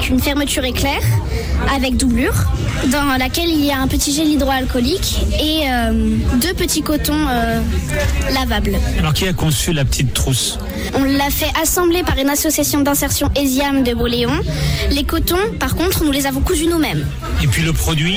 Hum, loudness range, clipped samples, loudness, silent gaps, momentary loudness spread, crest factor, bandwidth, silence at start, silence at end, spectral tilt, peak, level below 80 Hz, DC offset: none; 2 LU; under 0.1%; -16 LUFS; none; 3 LU; 10 dB; 17 kHz; 0 s; 0 s; -4.5 dB/octave; -6 dBFS; -24 dBFS; under 0.1%